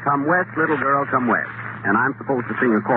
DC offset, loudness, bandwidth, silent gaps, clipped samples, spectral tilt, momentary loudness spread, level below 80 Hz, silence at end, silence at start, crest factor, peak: under 0.1%; -20 LUFS; 4.1 kHz; none; under 0.1%; -6.5 dB/octave; 6 LU; -64 dBFS; 0 s; 0 s; 14 dB; -6 dBFS